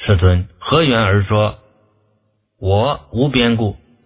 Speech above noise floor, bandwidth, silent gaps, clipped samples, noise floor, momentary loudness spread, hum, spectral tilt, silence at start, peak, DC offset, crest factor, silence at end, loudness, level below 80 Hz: 49 dB; 4 kHz; none; under 0.1%; -63 dBFS; 6 LU; none; -11 dB/octave; 0 s; 0 dBFS; under 0.1%; 16 dB; 0.3 s; -16 LUFS; -28 dBFS